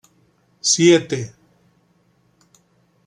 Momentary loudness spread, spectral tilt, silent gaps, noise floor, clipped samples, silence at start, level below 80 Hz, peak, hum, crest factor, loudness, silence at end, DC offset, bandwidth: 15 LU; -3.5 dB/octave; none; -60 dBFS; under 0.1%; 0.65 s; -66 dBFS; -2 dBFS; none; 20 dB; -16 LUFS; 1.8 s; under 0.1%; 11 kHz